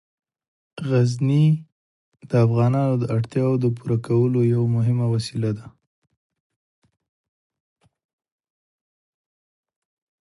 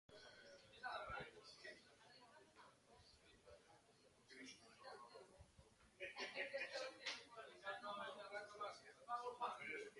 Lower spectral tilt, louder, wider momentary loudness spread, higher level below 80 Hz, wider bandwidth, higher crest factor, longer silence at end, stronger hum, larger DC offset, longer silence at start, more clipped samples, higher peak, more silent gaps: first, -8.5 dB/octave vs -2.5 dB/octave; first, -21 LUFS vs -53 LUFS; second, 7 LU vs 20 LU; first, -58 dBFS vs -80 dBFS; about the same, 11.5 kHz vs 11.5 kHz; about the same, 18 dB vs 20 dB; first, 4.55 s vs 0 s; neither; neither; first, 0.75 s vs 0.1 s; neither; first, -6 dBFS vs -34 dBFS; first, 1.72-2.12 s vs none